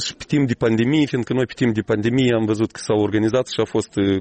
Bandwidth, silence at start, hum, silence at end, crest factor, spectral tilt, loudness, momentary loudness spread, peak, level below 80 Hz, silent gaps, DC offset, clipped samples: 8.8 kHz; 0 s; none; 0 s; 12 dB; -6 dB/octave; -20 LUFS; 4 LU; -8 dBFS; -50 dBFS; none; under 0.1%; under 0.1%